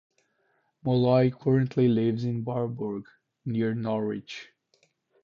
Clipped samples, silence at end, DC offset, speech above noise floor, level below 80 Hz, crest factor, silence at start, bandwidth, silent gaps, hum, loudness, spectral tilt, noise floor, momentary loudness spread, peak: under 0.1%; 0.8 s; under 0.1%; 46 dB; -62 dBFS; 16 dB; 0.85 s; 7 kHz; none; none; -27 LUFS; -9 dB/octave; -72 dBFS; 15 LU; -10 dBFS